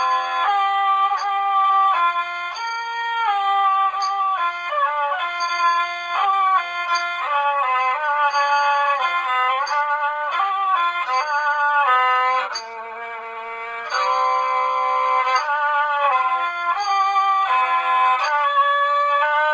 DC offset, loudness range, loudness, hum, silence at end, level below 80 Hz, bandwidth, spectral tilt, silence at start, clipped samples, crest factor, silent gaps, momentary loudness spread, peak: under 0.1%; 2 LU; -19 LUFS; none; 0 s; -72 dBFS; 8 kHz; 1 dB/octave; 0 s; under 0.1%; 14 dB; none; 7 LU; -6 dBFS